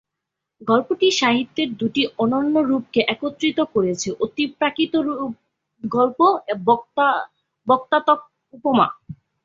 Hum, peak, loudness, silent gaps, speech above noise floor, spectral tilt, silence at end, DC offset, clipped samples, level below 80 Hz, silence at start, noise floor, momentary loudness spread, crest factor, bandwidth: none; -2 dBFS; -20 LUFS; none; 63 dB; -4.5 dB/octave; 0.3 s; under 0.1%; under 0.1%; -62 dBFS; 0.6 s; -82 dBFS; 8 LU; 18 dB; 7.6 kHz